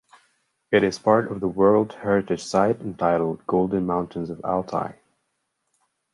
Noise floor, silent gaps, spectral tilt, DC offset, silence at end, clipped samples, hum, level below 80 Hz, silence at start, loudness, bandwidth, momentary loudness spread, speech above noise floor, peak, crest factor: -75 dBFS; none; -6.5 dB/octave; under 0.1%; 1.2 s; under 0.1%; none; -56 dBFS; 0.7 s; -23 LUFS; 11.5 kHz; 9 LU; 54 dB; -4 dBFS; 20 dB